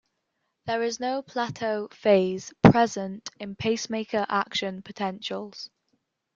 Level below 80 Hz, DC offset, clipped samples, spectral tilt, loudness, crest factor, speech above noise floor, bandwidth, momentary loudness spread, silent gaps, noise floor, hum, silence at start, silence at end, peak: -54 dBFS; under 0.1%; under 0.1%; -5.5 dB/octave; -26 LUFS; 24 dB; 52 dB; 7.6 kHz; 17 LU; none; -78 dBFS; none; 0.65 s; 0.7 s; -2 dBFS